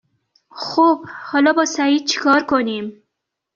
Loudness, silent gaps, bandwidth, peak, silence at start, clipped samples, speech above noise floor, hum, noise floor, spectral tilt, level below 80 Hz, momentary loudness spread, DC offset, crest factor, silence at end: -17 LUFS; none; 7.4 kHz; -2 dBFS; 0.55 s; under 0.1%; 61 dB; none; -79 dBFS; -1.5 dB/octave; -60 dBFS; 11 LU; under 0.1%; 16 dB; 0.65 s